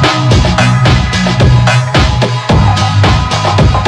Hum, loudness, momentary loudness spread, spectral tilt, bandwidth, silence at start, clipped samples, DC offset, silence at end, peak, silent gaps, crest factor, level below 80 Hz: none; -9 LUFS; 3 LU; -5.5 dB/octave; 11 kHz; 0 s; under 0.1%; under 0.1%; 0 s; 0 dBFS; none; 8 dB; -18 dBFS